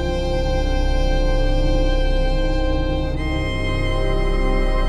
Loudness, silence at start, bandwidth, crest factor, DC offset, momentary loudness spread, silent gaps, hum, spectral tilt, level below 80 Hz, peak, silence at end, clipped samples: -22 LUFS; 0 s; 8.8 kHz; 10 dB; under 0.1%; 2 LU; none; none; -6.5 dB/octave; -20 dBFS; -8 dBFS; 0 s; under 0.1%